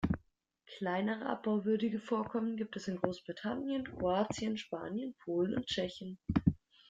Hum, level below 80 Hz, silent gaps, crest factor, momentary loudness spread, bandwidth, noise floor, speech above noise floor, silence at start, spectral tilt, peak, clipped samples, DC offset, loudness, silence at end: none; -58 dBFS; none; 22 dB; 8 LU; 7.8 kHz; -70 dBFS; 35 dB; 0 s; -6.5 dB/octave; -14 dBFS; under 0.1%; under 0.1%; -36 LUFS; 0.35 s